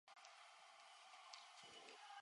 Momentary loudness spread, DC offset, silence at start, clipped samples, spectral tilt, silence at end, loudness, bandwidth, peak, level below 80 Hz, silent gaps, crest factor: 4 LU; under 0.1%; 0.05 s; under 0.1%; 0.5 dB/octave; 0 s; -61 LUFS; 11 kHz; -36 dBFS; under -90 dBFS; none; 26 dB